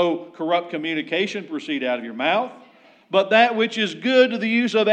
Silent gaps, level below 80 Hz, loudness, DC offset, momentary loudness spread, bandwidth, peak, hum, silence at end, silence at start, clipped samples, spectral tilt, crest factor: none; -88 dBFS; -21 LUFS; under 0.1%; 9 LU; 9 kHz; -2 dBFS; none; 0 s; 0 s; under 0.1%; -4.5 dB/octave; 18 dB